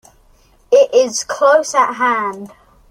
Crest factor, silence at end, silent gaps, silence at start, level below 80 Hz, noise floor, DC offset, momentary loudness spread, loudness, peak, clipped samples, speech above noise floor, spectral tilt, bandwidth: 14 dB; 0.45 s; none; 0.7 s; -56 dBFS; -51 dBFS; under 0.1%; 8 LU; -14 LUFS; 0 dBFS; under 0.1%; 35 dB; -2 dB/octave; 14.5 kHz